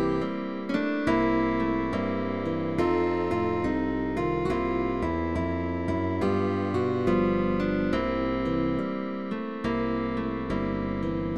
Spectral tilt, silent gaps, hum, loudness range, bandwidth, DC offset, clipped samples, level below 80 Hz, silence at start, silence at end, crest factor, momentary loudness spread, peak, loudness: -8 dB/octave; none; none; 2 LU; 9 kHz; 0.5%; under 0.1%; -44 dBFS; 0 s; 0 s; 16 dB; 5 LU; -12 dBFS; -27 LUFS